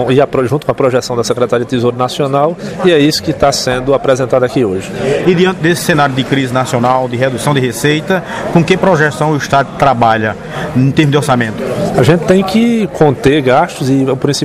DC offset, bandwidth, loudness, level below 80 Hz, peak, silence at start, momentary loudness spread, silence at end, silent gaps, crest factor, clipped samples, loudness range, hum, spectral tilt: under 0.1%; 15.5 kHz; -12 LUFS; -40 dBFS; 0 dBFS; 0 s; 5 LU; 0 s; none; 12 dB; under 0.1%; 1 LU; none; -5.5 dB/octave